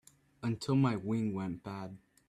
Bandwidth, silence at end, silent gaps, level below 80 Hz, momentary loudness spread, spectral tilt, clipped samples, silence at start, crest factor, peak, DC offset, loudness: 12.5 kHz; 0.3 s; none; -68 dBFS; 14 LU; -7.5 dB/octave; under 0.1%; 0.4 s; 16 dB; -18 dBFS; under 0.1%; -35 LUFS